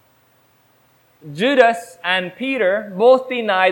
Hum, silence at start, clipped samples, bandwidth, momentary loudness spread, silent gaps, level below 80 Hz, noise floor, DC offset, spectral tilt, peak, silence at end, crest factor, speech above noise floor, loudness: none; 1.25 s; under 0.1%; 17 kHz; 9 LU; none; -68 dBFS; -57 dBFS; under 0.1%; -4.5 dB/octave; 0 dBFS; 0 s; 18 dB; 40 dB; -17 LUFS